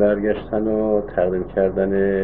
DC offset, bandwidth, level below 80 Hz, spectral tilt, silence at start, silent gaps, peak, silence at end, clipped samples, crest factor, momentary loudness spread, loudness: 0.8%; 4.1 kHz; -40 dBFS; -12 dB/octave; 0 s; none; -6 dBFS; 0 s; under 0.1%; 14 dB; 3 LU; -20 LUFS